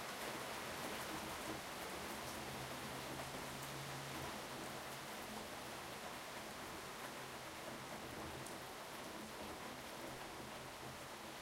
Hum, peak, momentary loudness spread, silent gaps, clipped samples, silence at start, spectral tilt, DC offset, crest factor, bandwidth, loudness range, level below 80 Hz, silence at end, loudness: none; -32 dBFS; 4 LU; none; under 0.1%; 0 s; -3 dB/octave; under 0.1%; 18 dB; 16 kHz; 3 LU; -68 dBFS; 0 s; -48 LUFS